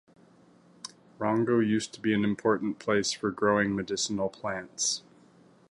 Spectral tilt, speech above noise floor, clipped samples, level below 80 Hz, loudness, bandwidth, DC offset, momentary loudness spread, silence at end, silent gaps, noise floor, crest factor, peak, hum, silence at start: -4 dB/octave; 31 dB; under 0.1%; -64 dBFS; -28 LUFS; 11.5 kHz; under 0.1%; 10 LU; 0.7 s; none; -59 dBFS; 18 dB; -12 dBFS; none; 0.85 s